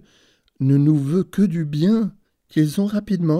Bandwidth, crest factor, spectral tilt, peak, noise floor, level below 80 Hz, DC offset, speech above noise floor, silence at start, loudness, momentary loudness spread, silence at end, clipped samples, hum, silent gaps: 14.5 kHz; 12 dB; -8.5 dB/octave; -6 dBFS; -59 dBFS; -56 dBFS; under 0.1%; 41 dB; 0.6 s; -20 LUFS; 7 LU; 0 s; under 0.1%; none; none